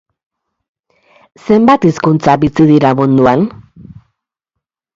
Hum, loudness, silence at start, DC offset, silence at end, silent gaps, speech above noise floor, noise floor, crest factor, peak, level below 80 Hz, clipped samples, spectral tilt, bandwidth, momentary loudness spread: none; -10 LUFS; 1.45 s; under 0.1%; 1.45 s; none; 68 dB; -77 dBFS; 12 dB; 0 dBFS; -44 dBFS; under 0.1%; -8 dB/octave; 7.6 kHz; 6 LU